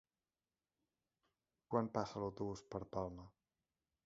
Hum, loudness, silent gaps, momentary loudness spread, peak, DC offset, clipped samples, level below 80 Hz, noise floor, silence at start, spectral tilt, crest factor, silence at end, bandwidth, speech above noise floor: none; -44 LUFS; none; 11 LU; -22 dBFS; under 0.1%; under 0.1%; -70 dBFS; under -90 dBFS; 1.7 s; -7 dB/octave; 26 dB; 0.75 s; 7.4 kHz; over 47 dB